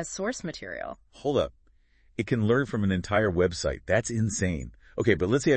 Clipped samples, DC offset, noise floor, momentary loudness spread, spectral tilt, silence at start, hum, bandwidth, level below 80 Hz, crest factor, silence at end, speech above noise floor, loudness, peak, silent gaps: under 0.1%; under 0.1%; -61 dBFS; 12 LU; -5.5 dB/octave; 0 s; none; 8.8 kHz; -48 dBFS; 20 dB; 0 s; 35 dB; -28 LUFS; -8 dBFS; none